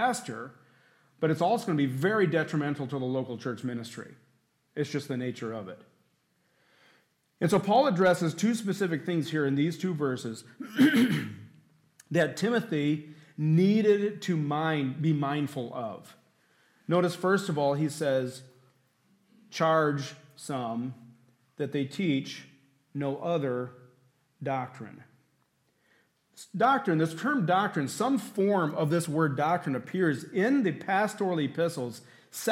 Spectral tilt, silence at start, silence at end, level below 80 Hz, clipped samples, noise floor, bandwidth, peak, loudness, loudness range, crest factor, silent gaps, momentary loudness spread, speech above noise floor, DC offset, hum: -6 dB/octave; 0 s; 0 s; -78 dBFS; under 0.1%; -71 dBFS; 16 kHz; -12 dBFS; -28 LUFS; 8 LU; 16 dB; none; 16 LU; 44 dB; under 0.1%; none